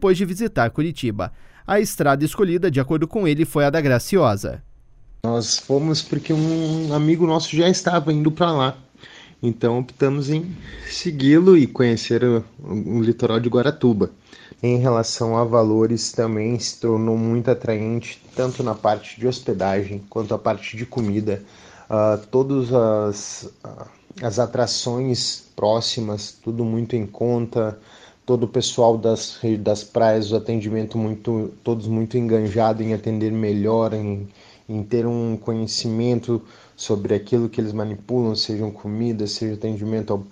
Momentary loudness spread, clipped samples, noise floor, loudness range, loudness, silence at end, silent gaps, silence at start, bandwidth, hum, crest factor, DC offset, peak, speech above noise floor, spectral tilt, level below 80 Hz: 9 LU; under 0.1%; -45 dBFS; 5 LU; -21 LUFS; 0 s; none; 0 s; 16 kHz; none; 20 dB; under 0.1%; -2 dBFS; 25 dB; -6 dB/octave; -50 dBFS